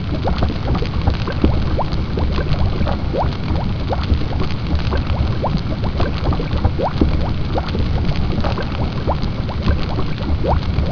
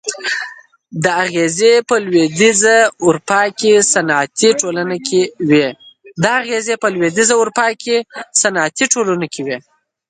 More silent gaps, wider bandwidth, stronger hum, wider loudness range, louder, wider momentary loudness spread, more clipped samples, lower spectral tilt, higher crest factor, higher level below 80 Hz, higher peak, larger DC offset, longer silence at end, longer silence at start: neither; second, 5.4 kHz vs 9.6 kHz; neither; about the same, 1 LU vs 3 LU; second, -20 LUFS vs -14 LUFS; second, 3 LU vs 9 LU; neither; first, -8 dB/octave vs -3 dB/octave; about the same, 18 dB vs 14 dB; first, -22 dBFS vs -60 dBFS; about the same, 0 dBFS vs 0 dBFS; first, 3% vs under 0.1%; second, 0 s vs 0.5 s; about the same, 0 s vs 0.05 s